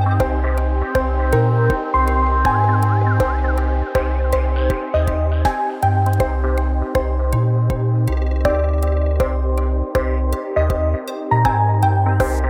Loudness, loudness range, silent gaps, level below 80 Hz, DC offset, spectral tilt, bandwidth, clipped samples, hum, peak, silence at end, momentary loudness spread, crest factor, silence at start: -18 LUFS; 2 LU; none; -20 dBFS; under 0.1%; -8 dB/octave; 16 kHz; under 0.1%; none; -2 dBFS; 0 s; 4 LU; 14 dB; 0 s